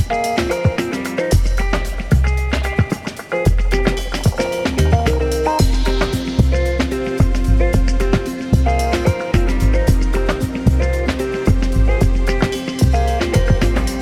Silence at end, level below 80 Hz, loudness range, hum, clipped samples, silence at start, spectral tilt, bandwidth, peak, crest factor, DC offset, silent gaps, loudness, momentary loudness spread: 0 s; -18 dBFS; 2 LU; none; under 0.1%; 0 s; -6 dB/octave; 15 kHz; -2 dBFS; 14 dB; under 0.1%; none; -18 LUFS; 4 LU